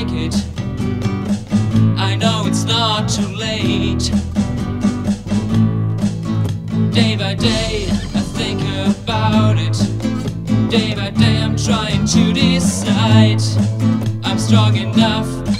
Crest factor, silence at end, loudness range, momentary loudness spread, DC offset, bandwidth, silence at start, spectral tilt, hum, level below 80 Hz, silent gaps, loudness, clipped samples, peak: 16 dB; 0 s; 4 LU; 7 LU; under 0.1%; 12.5 kHz; 0 s; -5.5 dB/octave; none; -34 dBFS; none; -16 LUFS; under 0.1%; 0 dBFS